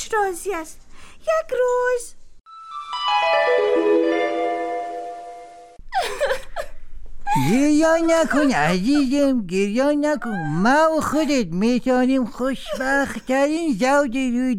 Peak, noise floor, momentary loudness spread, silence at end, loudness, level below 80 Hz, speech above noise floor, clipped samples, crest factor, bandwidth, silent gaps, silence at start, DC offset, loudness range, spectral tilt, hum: -8 dBFS; -41 dBFS; 13 LU; 0 s; -20 LUFS; -42 dBFS; 22 dB; under 0.1%; 12 dB; 16.5 kHz; none; 0 s; under 0.1%; 5 LU; -5 dB/octave; none